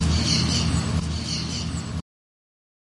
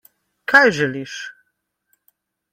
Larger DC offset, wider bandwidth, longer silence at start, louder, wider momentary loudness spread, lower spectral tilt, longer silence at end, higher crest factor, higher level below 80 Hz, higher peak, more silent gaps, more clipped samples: neither; second, 11.5 kHz vs 16 kHz; second, 0 s vs 0.5 s; second, -24 LUFS vs -16 LUFS; second, 11 LU vs 20 LU; about the same, -4 dB/octave vs -4.5 dB/octave; second, 1 s vs 1.2 s; about the same, 16 dB vs 20 dB; first, -36 dBFS vs -64 dBFS; second, -10 dBFS vs 0 dBFS; neither; neither